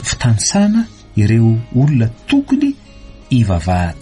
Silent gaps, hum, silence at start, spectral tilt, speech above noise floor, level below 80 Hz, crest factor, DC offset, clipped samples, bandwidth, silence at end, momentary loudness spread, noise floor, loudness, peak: none; none; 0 s; -5.5 dB/octave; 21 dB; -34 dBFS; 12 dB; under 0.1%; under 0.1%; 11.5 kHz; 0 s; 6 LU; -34 dBFS; -15 LUFS; -2 dBFS